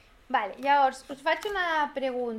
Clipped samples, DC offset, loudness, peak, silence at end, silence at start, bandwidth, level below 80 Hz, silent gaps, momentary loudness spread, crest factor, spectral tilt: under 0.1%; under 0.1%; -27 LUFS; -10 dBFS; 0 s; 0.3 s; 14.5 kHz; -60 dBFS; none; 7 LU; 16 dB; -3 dB/octave